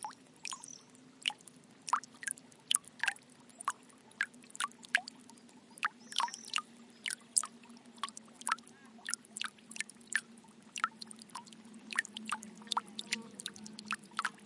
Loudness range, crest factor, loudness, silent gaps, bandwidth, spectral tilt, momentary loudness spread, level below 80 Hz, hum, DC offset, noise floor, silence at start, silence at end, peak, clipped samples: 3 LU; 38 dB; -39 LUFS; none; 11.5 kHz; 0.5 dB/octave; 20 LU; under -90 dBFS; none; under 0.1%; -59 dBFS; 0 s; 0 s; -4 dBFS; under 0.1%